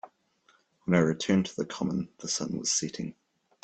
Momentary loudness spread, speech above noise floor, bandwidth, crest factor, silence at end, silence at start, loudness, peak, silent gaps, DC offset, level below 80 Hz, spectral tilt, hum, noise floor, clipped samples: 12 LU; 38 dB; 9 kHz; 22 dB; 0.5 s; 0.05 s; -29 LUFS; -8 dBFS; none; under 0.1%; -64 dBFS; -4.5 dB/octave; none; -67 dBFS; under 0.1%